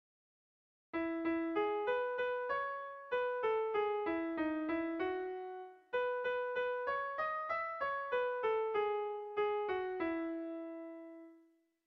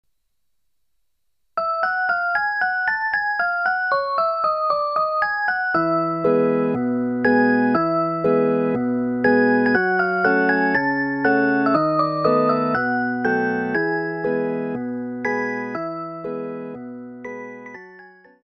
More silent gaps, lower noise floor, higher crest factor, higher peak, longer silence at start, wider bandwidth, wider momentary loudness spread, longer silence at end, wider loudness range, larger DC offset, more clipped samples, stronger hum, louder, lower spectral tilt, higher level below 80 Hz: neither; second, -69 dBFS vs -78 dBFS; about the same, 14 dB vs 16 dB; second, -24 dBFS vs -4 dBFS; second, 0.95 s vs 1.55 s; about the same, 6 kHz vs 6.2 kHz; second, 9 LU vs 12 LU; first, 0.5 s vs 0.35 s; second, 2 LU vs 7 LU; neither; neither; neither; second, -38 LUFS vs -20 LUFS; second, -2 dB/octave vs -8 dB/octave; second, -74 dBFS vs -60 dBFS